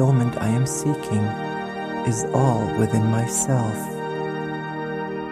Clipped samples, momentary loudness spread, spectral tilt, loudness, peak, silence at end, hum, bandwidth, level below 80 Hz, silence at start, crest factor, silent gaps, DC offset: under 0.1%; 8 LU; -6 dB/octave; -23 LUFS; -4 dBFS; 0 s; none; 15 kHz; -52 dBFS; 0 s; 18 dB; none; under 0.1%